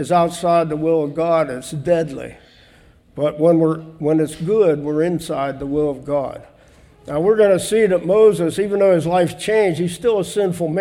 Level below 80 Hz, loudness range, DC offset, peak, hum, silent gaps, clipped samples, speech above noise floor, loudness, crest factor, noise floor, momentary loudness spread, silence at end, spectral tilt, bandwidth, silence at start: -50 dBFS; 4 LU; under 0.1%; -4 dBFS; none; none; under 0.1%; 32 dB; -18 LUFS; 14 dB; -50 dBFS; 9 LU; 0 s; -6 dB/octave; 15 kHz; 0 s